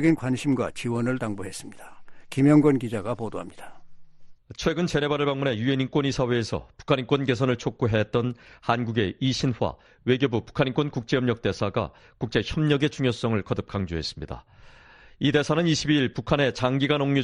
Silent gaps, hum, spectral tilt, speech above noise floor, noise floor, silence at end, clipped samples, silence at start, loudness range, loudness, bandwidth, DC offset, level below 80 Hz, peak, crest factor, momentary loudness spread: none; none; -6 dB/octave; 26 dB; -51 dBFS; 0 s; under 0.1%; 0 s; 2 LU; -25 LUFS; 12 kHz; under 0.1%; -50 dBFS; -6 dBFS; 18 dB; 11 LU